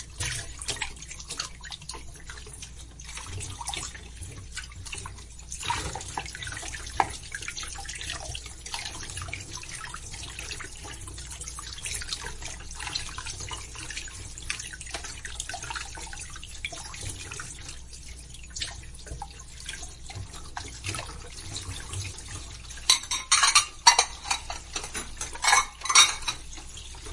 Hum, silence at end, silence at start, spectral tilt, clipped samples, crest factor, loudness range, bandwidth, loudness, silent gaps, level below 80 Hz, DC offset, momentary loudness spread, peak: none; 0 s; 0 s; 0 dB/octave; under 0.1%; 30 dB; 15 LU; 12 kHz; -29 LUFS; none; -44 dBFS; under 0.1%; 19 LU; -2 dBFS